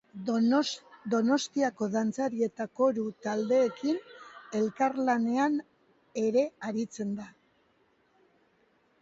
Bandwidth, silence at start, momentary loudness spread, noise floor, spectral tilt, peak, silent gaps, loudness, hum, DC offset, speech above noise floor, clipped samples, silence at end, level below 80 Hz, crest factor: 8 kHz; 0.15 s; 10 LU; -69 dBFS; -5 dB/octave; -14 dBFS; none; -30 LUFS; none; under 0.1%; 40 dB; under 0.1%; 1.7 s; -76 dBFS; 16 dB